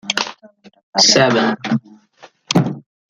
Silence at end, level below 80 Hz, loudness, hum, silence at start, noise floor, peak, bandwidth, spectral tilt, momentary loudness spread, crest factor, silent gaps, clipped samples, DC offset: 0.3 s; -60 dBFS; -15 LUFS; none; 0.05 s; -47 dBFS; 0 dBFS; 13.5 kHz; -3 dB/octave; 13 LU; 18 dB; 0.83-0.93 s; under 0.1%; under 0.1%